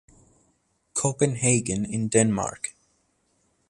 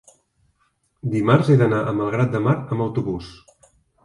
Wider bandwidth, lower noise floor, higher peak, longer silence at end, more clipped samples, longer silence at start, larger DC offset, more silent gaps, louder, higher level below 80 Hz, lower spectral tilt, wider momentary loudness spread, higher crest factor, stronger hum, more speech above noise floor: about the same, 11.5 kHz vs 11.5 kHz; about the same, -69 dBFS vs -67 dBFS; about the same, -4 dBFS vs -2 dBFS; first, 1 s vs 0.7 s; neither; about the same, 0.95 s vs 1.05 s; neither; neither; second, -24 LUFS vs -20 LUFS; about the same, -56 dBFS vs -52 dBFS; second, -5 dB/octave vs -8.5 dB/octave; second, 10 LU vs 14 LU; about the same, 22 dB vs 20 dB; neither; about the same, 46 dB vs 48 dB